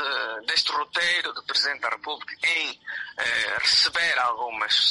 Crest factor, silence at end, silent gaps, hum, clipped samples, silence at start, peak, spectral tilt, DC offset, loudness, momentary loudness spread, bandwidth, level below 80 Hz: 18 dB; 0 s; none; none; under 0.1%; 0 s; -8 dBFS; 1 dB/octave; under 0.1%; -23 LUFS; 10 LU; 11.5 kHz; -66 dBFS